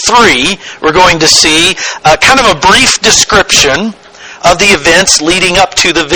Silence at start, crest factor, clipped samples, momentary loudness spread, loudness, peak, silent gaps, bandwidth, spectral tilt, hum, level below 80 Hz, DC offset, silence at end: 0 s; 8 dB; 3%; 7 LU; -5 LUFS; 0 dBFS; none; over 20 kHz; -1.5 dB/octave; none; -30 dBFS; 0.8%; 0 s